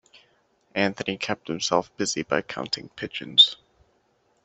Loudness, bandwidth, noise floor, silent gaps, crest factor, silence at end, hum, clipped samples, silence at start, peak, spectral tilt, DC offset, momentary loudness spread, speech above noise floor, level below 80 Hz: -23 LUFS; 8.2 kHz; -67 dBFS; none; 24 dB; 0.9 s; none; under 0.1%; 0.75 s; -2 dBFS; -2.5 dB/octave; under 0.1%; 17 LU; 42 dB; -64 dBFS